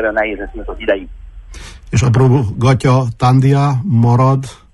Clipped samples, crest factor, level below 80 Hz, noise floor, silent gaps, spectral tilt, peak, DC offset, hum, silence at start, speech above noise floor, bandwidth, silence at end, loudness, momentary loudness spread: under 0.1%; 12 dB; -34 dBFS; -32 dBFS; none; -7.5 dB/octave; 0 dBFS; under 0.1%; none; 0 s; 20 dB; 11 kHz; 0.2 s; -13 LUFS; 14 LU